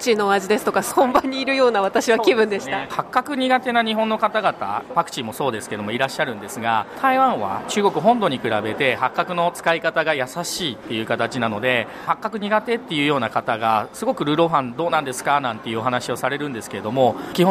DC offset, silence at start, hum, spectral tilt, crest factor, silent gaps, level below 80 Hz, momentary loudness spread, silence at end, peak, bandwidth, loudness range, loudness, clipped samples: under 0.1%; 0 s; none; -4.5 dB/octave; 16 dB; none; -58 dBFS; 7 LU; 0 s; -4 dBFS; 15.5 kHz; 3 LU; -21 LUFS; under 0.1%